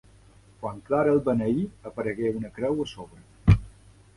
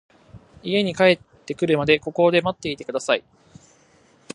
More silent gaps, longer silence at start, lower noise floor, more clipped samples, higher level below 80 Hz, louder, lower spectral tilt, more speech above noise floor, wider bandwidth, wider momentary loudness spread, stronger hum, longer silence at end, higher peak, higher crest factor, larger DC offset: neither; first, 0.6 s vs 0.35 s; about the same, -54 dBFS vs -56 dBFS; neither; first, -38 dBFS vs -58 dBFS; second, -26 LUFS vs -21 LUFS; first, -8.5 dB/octave vs -5 dB/octave; second, 28 dB vs 36 dB; about the same, 11.5 kHz vs 11 kHz; first, 14 LU vs 10 LU; neither; second, 0.5 s vs 1.15 s; about the same, -4 dBFS vs -2 dBFS; about the same, 22 dB vs 20 dB; neither